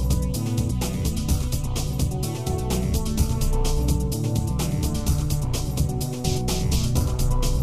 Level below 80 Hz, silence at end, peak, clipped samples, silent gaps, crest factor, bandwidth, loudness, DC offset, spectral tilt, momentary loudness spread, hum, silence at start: -26 dBFS; 0 s; -8 dBFS; under 0.1%; none; 14 dB; 15.5 kHz; -25 LUFS; 0.7%; -5.5 dB/octave; 3 LU; none; 0 s